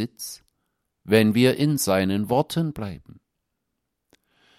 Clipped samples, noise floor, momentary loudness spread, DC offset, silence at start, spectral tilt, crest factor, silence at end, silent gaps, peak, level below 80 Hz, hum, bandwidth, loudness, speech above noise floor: under 0.1%; -79 dBFS; 17 LU; under 0.1%; 0 s; -5.5 dB/octave; 22 dB; 1.65 s; none; -4 dBFS; -58 dBFS; none; 16 kHz; -22 LUFS; 57 dB